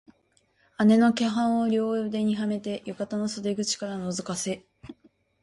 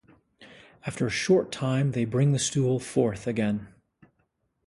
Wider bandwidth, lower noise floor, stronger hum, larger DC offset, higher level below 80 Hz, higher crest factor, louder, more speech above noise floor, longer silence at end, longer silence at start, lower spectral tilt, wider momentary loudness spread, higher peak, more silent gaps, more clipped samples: about the same, 11.5 kHz vs 11.5 kHz; second, -67 dBFS vs -73 dBFS; neither; neither; second, -66 dBFS vs -58 dBFS; about the same, 16 dB vs 18 dB; about the same, -26 LUFS vs -26 LUFS; second, 42 dB vs 48 dB; second, 0.5 s vs 1 s; first, 0.8 s vs 0.4 s; about the same, -5 dB/octave vs -5.5 dB/octave; first, 12 LU vs 7 LU; about the same, -10 dBFS vs -10 dBFS; neither; neither